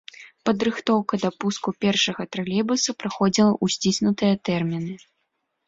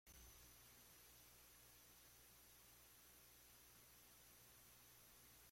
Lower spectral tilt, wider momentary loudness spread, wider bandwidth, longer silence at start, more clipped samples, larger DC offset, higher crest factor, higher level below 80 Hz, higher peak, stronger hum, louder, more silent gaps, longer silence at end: first, -4.5 dB/octave vs -1.5 dB/octave; first, 9 LU vs 1 LU; second, 7.8 kHz vs 16.5 kHz; first, 0.2 s vs 0.05 s; neither; neither; about the same, 16 dB vs 14 dB; first, -60 dBFS vs -78 dBFS; first, -6 dBFS vs -54 dBFS; second, none vs 60 Hz at -80 dBFS; first, -23 LUFS vs -65 LUFS; neither; first, 0.7 s vs 0 s